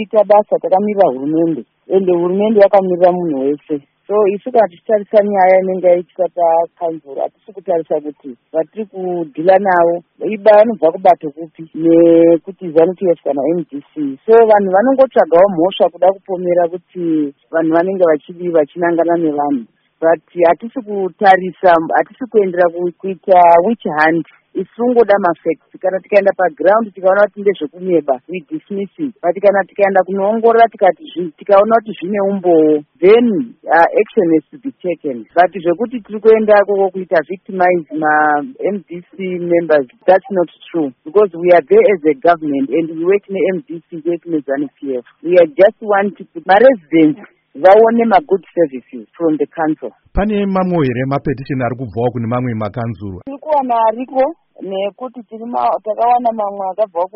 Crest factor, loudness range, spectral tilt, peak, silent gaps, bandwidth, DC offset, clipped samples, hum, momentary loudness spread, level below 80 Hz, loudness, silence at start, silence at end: 14 dB; 5 LU; -5.5 dB/octave; 0 dBFS; none; 5.6 kHz; under 0.1%; under 0.1%; none; 13 LU; -46 dBFS; -14 LUFS; 0 s; 0.1 s